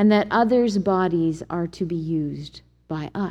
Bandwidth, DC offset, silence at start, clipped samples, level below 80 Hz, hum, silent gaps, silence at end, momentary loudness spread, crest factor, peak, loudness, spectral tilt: 9 kHz; under 0.1%; 0 s; under 0.1%; -52 dBFS; none; none; 0 s; 13 LU; 16 dB; -6 dBFS; -22 LUFS; -7.5 dB/octave